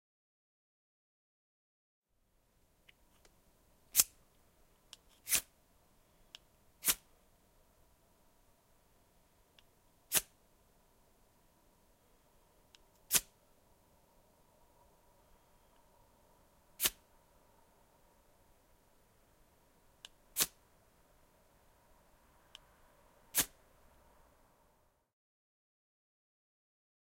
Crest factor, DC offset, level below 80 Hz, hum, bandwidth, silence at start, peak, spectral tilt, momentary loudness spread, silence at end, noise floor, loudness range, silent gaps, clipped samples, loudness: 36 dB; under 0.1%; -70 dBFS; none; 16.5 kHz; 3.95 s; -10 dBFS; 1 dB/octave; 28 LU; 3.7 s; -76 dBFS; 6 LU; none; under 0.1%; -34 LUFS